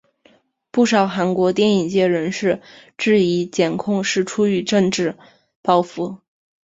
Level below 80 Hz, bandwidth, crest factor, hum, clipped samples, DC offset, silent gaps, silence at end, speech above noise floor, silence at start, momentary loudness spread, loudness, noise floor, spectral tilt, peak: -60 dBFS; 8 kHz; 18 dB; none; under 0.1%; under 0.1%; 5.56-5.63 s; 0.5 s; 38 dB; 0.75 s; 9 LU; -19 LUFS; -56 dBFS; -5 dB/octave; -2 dBFS